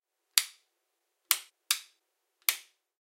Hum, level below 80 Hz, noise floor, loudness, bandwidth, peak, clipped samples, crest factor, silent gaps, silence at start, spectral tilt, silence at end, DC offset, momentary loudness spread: none; under -90 dBFS; -81 dBFS; -30 LUFS; 16 kHz; -2 dBFS; under 0.1%; 34 dB; none; 0.35 s; 8 dB/octave; 0.4 s; under 0.1%; 6 LU